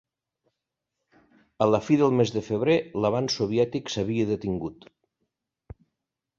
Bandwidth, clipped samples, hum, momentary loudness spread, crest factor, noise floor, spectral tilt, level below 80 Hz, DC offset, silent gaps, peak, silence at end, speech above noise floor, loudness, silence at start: 7.6 kHz; under 0.1%; none; 8 LU; 20 dB; -84 dBFS; -6 dB/octave; -56 dBFS; under 0.1%; none; -6 dBFS; 1.65 s; 60 dB; -25 LUFS; 1.6 s